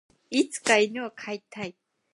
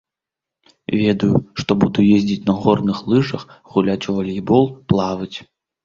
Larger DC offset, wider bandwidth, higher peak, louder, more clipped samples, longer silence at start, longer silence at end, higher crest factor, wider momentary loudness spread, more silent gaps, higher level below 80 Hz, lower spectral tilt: neither; first, 11.5 kHz vs 7.2 kHz; second, -6 dBFS vs -2 dBFS; second, -26 LUFS vs -18 LUFS; neither; second, 0.3 s vs 0.9 s; about the same, 0.45 s vs 0.4 s; about the same, 22 dB vs 18 dB; first, 16 LU vs 10 LU; neither; second, -76 dBFS vs -48 dBFS; second, -2.5 dB/octave vs -7.5 dB/octave